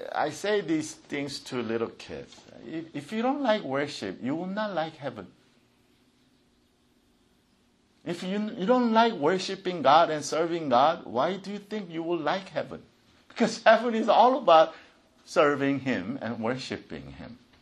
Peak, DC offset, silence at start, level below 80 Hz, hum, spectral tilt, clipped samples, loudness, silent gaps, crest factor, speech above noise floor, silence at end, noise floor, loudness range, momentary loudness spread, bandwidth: -4 dBFS; under 0.1%; 0 s; -68 dBFS; none; -5 dB/octave; under 0.1%; -26 LUFS; none; 22 dB; 39 dB; 0.25 s; -66 dBFS; 13 LU; 19 LU; 12.5 kHz